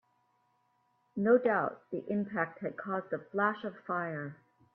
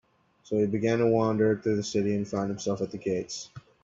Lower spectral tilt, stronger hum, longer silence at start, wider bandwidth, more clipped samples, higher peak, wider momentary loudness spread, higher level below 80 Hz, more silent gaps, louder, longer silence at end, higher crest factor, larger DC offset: first, -10 dB/octave vs -6 dB/octave; neither; first, 1.15 s vs 0.5 s; second, 4.3 kHz vs 7.8 kHz; neither; about the same, -14 dBFS vs -12 dBFS; first, 14 LU vs 8 LU; second, -80 dBFS vs -64 dBFS; neither; second, -33 LUFS vs -28 LUFS; first, 0.4 s vs 0.25 s; about the same, 20 dB vs 16 dB; neither